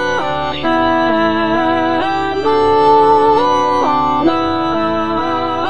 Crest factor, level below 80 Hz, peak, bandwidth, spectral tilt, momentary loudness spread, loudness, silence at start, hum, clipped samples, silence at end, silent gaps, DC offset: 12 dB; -42 dBFS; 0 dBFS; 9.4 kHz; -5.5 dB/octave; 6 LU; -14 LUFS; 0 s; none; under 0.1%; 0 s; none; 3%